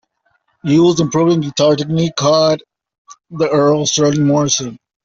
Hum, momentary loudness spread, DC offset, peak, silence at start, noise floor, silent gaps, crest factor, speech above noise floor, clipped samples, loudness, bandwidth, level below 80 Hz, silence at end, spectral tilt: none; 8 LU; under 0.1%; -2 dBFS; 0.65 s; -63 dBFS; 2.98-3.05 s; 12 dB; 49 dB; under 0.1%; -14 LUFS; 8 kHz; -52 dBFS; 0.3 s; -5 dB/octave